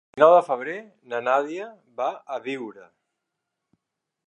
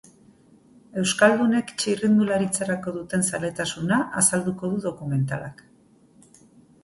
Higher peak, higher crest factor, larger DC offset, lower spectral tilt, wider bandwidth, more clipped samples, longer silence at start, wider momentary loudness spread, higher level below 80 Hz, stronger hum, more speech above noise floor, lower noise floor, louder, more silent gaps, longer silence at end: about the same, -2 dBFS vs -4 dBFS; about the same, 22 dB vs 20 dB; neither; about the same, -5.5 dB/octave vs -4.5 dB/octave; second, 10 kHz vs 12 kHz; neither; second, 0.15 s vs 0.95 s; first, 20 LU vs 10 LU; second, -82 dBFS vs -60 dBFS; neither; first, 59 dB vs 33 dB; first, -82 dBFS vs -56 dBFS; about the same, -23 LUFS vs -23 LUFS; neither; first, 1.5 s vs 1.3 s